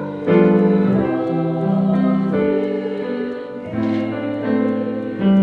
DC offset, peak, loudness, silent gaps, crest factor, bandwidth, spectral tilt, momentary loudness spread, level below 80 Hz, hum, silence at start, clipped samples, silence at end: under 0.1%; 0 dBFS; -18 LUFS; none; 16 dB; 4.7 kHz; -10 dB/octave; 9 LU; -58 dBFS; none; 0 s; under 0.1%; 0 s